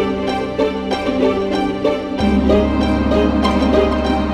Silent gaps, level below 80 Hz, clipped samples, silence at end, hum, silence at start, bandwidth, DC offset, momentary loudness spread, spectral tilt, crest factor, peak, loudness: none; -28 dBFS; under 0.1%; 0 s; none; 0 s; 11.5 kHz; under 0.1%; 5 LU; -7 dB/octave; 14 dB; -2 dBFS; -17 LUFS